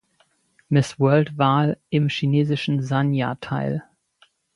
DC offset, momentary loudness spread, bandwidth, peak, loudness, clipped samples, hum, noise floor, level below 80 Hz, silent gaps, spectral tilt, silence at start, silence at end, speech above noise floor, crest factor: under 0.1%; 7 LU; 11 kHz; -4 dBFS; -21 LUFS; under 0.1%; none; -64 dBFS; -60 dBFS; none; -7.5 dB/octave; 0.7 s; 0.75 s; 44 dB; 18 dB